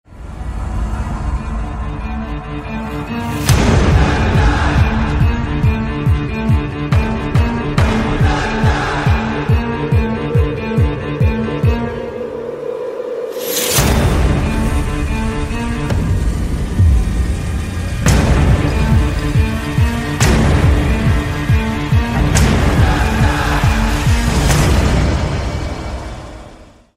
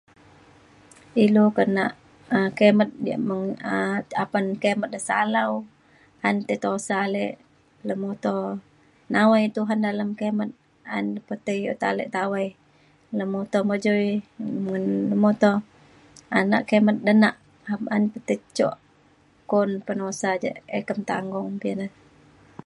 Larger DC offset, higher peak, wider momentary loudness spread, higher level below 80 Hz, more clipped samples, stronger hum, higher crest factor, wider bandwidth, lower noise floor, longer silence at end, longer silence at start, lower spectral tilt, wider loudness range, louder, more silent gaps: neither; first, 0 dBFS vs -4 dBFS; about the same, 11 LU vs 12 LU; first, -18 dBFS vs -68 dBFS; neither; neither; second, 14 dB vs 20 dB; first, 16 kHz vs 11 kHz; second, -39 dBFS vs -58 dBFS; second, 0.3 s vs 0.8 s; second, 0.1 s vs 1.15 s; about the same, -5.5 dB/octave vs -6 dB/octave; about the same, 4 LU vs 6 LU; first, -16 LUFS vs -24 LUFS; neither